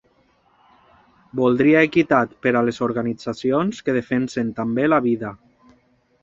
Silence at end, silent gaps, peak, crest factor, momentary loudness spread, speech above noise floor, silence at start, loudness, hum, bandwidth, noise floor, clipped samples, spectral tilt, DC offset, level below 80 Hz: 0.85 s; none; -2 dBFS; 18 dB; 10 LU; 41 dB; 1.35 s; -20 LUFS; none; 7.8 kHz; -60 dBFS; under 0.1%; -7 dB/octave; under 0.1%; -58 dBFS